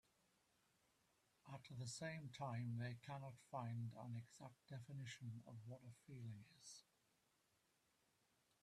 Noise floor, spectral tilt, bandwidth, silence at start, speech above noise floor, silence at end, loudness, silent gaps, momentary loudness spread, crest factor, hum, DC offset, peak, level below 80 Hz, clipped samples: -84 dBFS; -5.5 dB/octave; 13 kHz; 1.45 s; 31 dB; 1.8 s; -54 LUFS; none; 12 LU; 18 dB; none; under 0.1%; -36 dBFS; -86 dBFS; under 0.1%